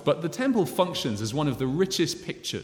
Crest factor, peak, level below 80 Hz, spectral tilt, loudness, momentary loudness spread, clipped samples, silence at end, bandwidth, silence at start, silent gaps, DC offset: 18 dB; -8 dBFS; -56 dBFS; -5 dB/octave; -27 LUFS; 4 LU; under 0.1%; 0 s; 18 kHz; 0 s; none; under 0.1%